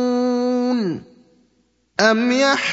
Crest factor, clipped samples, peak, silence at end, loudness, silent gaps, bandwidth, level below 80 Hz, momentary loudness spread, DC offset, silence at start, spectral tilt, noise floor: 20 dB; under 0.1%; 0 dBFS; 0 s; -18 LUFS; none; 8 kHz; -68 dBFS; 11 LU; under 0.1%; 0 s; -4 dB/octave; -63 dBFS